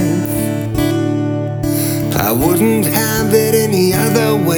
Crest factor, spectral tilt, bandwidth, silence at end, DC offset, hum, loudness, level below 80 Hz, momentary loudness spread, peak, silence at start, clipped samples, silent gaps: 14 dB; -5.5 dB/octave; over 20 kHz; 0 s; under 0.1%; none; -14 LUFS; -36 dBFS; 5 LU; 0 dBFS; 0 s; under 0.1%; none